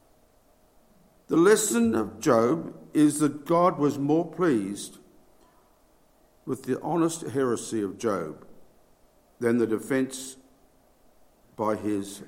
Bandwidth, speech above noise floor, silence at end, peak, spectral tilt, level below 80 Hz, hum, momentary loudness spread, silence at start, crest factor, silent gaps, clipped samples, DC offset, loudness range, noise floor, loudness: 16.5 kHz; 36 dB; 0 s; -6 dBFS; -5 dB/octave; -66 dBFS; none; 13 LU; 1.3 s; 20 dB; none; under 0.1%; under 0.1%; 8 LU; -61 dBFS; -26 LUFS